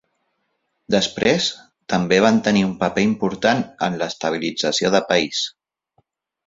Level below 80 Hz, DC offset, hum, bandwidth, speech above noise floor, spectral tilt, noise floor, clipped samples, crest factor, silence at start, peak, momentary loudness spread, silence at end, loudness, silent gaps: -54 dBFS; under 0.1%; none; 7.8 kHz; 53 dB; -4.5 dB/octave; -72 dBFS; under 0.1%; 20 dB; 0.9 s; -2 dBFS; 8 LU; 1 s; -19 LUFS; none